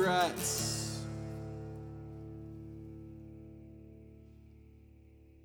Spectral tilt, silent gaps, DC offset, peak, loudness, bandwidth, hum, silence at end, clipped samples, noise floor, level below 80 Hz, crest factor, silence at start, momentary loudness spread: -3.5 dB/octave; none; under 0.1%; -16 dBFS; -38 LUFS; over 20 kHz; none; 0 s; under 0.1%; -59 dBFS; -56 dBFS; 22 dB; 0 s; 26 LU